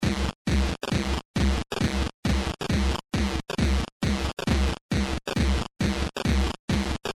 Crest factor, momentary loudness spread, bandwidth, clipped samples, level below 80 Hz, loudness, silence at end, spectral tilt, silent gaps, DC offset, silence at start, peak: 14 dB; 2 LU; 13.5 kHz; under 0.1%; -30 dBFS; -27 LUFS; 0.05 s; -5.5 dB/octave; 0.35-0.45 s, 1.25-1.34 s, 2.14-2.23 s, 3.92-4.00 s, 4.81-4.89 s, 6.59-6.68 s; under 0.1%; 0 s; -10 dBFS